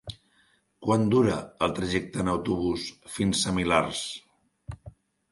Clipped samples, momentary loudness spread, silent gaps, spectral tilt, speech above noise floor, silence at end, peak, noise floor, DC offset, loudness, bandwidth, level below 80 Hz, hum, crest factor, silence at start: under 0.1%; 20 LU; none; -5 dB/octave; 40 dB; 0.4 s; -8 dBFS; -66 dBFS; under 0.1%; -27 LUFS; 11.5 kHz; -50 dBFS; none; 22 dB; 0.05 s